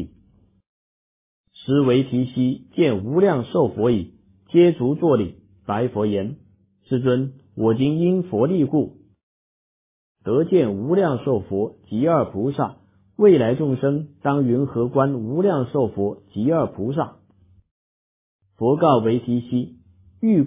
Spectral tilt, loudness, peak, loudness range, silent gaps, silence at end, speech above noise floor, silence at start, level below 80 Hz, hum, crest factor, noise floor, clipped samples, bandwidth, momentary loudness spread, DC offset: -12 dB/octave; -21 LUFS; -2 dBFS; 3 LU; 0.67-1.44 s, 9.23-10.15 s, 17.71-18.39 s; 0 s; 38 dB; 0 s; -52 dBFS; none; 18 dB; -57 dBFS; under 0.1%; 3.8 kHz; 10 LU; under 0.1%